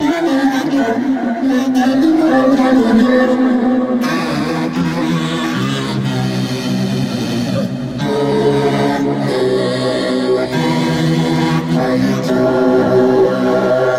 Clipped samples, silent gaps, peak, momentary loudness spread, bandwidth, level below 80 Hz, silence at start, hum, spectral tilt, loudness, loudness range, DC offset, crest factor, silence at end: under 0.1%; none; -2 dBFS; 6 LU; 15 kHz; -46 dBFS; 0 s; none; -6.5 dB/octave; -14 LUFS; 5 LU; under 0.1%; 12 dB; 0 s